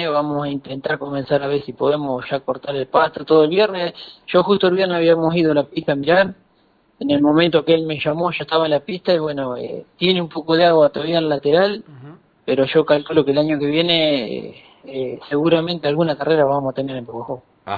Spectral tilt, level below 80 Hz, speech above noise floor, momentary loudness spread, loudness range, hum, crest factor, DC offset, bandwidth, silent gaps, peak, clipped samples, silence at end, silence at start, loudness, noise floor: -8.5 dB/octave; -56 dBFS; 40 dB; 12 LU; 2 LU; none; 16 dB; under 0.1%; 4.9 kHz; none; -2 dBFS; under 0.1%; 0 s; 0 s; -18 LUFS; -58 dBFS